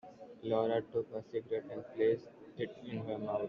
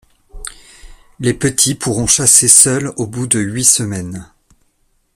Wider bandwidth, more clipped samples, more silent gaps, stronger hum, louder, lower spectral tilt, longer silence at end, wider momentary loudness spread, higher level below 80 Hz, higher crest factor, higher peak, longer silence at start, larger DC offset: second, 6 kHz vs over 20 kHz; second, under 0.1% vs 0.2%; neither; neither; second, -37 LUFS vs -11 LUFS; first, -6 dB/octave vs -2.5 dB/octave; second, 0 s vs 0.9 s; second, 12 LU vs 24 LU; second, -76 dBFS vs -42 dBFS; about the same, 18 dB vs 16 dB; second, -20 dBFS vs 0 dBFS; second, 0.05 s vs 0.35 s; neither